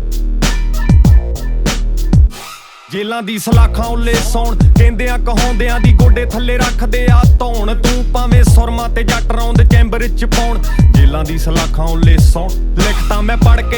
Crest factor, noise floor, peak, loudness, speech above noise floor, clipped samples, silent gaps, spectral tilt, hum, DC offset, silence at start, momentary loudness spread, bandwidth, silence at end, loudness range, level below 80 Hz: 10 dB; -32 dBFS; 0 dBFS; -13 LUFS; 23 dB; 0.4%; none; -6 dB/octave; none; under 0.1%; 0 s; 9 LU; over 20 kHz; 0 s; 3 LU; -12 dBFS